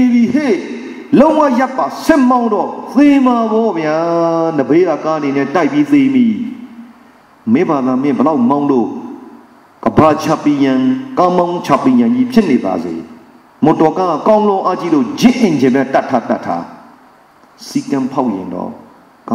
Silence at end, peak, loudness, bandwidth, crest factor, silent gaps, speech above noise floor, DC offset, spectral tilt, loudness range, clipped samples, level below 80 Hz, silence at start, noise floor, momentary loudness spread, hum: 0 s; 0 dBFS; -13 LUFS; 14.5 kHz; 12 dB; none; 33 dB; under 0.1%; -6.5 dB/octave; 4 LU; under 0.1%; -48 dBFS; 0 s; -45 dBFS; 11 LU; none